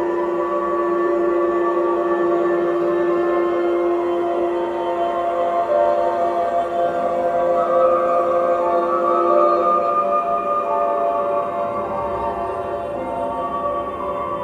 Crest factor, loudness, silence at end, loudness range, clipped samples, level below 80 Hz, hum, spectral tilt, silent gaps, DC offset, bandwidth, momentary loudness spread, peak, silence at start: 14 dB; -19 LUFS; 0 s; 4 LU; under 0.1%; -52 dBFS; none; -7 dB/octave; none; under 0.1%; 7.6 kHz; 7 LU; -4 dBFS; 0 s